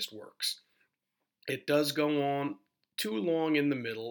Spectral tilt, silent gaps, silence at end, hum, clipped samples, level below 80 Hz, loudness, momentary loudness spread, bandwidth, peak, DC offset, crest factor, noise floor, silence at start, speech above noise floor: -4.5 dB/octave; none; 0 s; none; under 0.1%; -90 dBFS; -32 LUFS; 13 LU; over 20 kHz; -16 dBFS; under 0.1%; 18 dB; -85 dBFS; 0 s; 54 dB